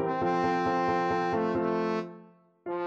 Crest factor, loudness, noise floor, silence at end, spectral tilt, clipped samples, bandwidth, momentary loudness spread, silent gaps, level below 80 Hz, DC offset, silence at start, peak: 14 dB; -28 LUFS; -55 dBFS; 0 s; -7 dB/octave; under 0.1%; 8 kHz; 10 LU; none; -62 dBFS; under 0.1%; 0 s; -14 dBFS